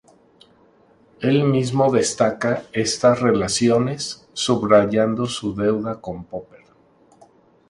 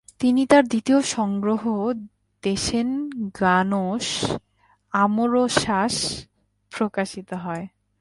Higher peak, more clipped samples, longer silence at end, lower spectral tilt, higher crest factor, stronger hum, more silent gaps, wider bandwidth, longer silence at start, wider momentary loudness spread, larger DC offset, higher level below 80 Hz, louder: about the same, 0 dBFS vs -2 dBFS; neither; first, 1.25 s vs 0.35 s; about the same, -5 dB/octave vs -4.5 dB/octave; about the same, 20 dB vs 20 dB; neither; neither; about the same, 11.5 kHz vs 11.5 kHz; first, 1.2 s vs 0.2 s; about the same, 13 LU vs 13 LU; neither; about the same, -52 dBFS vs -52 dBFS; first, -19 LUFS vs -22 LUFS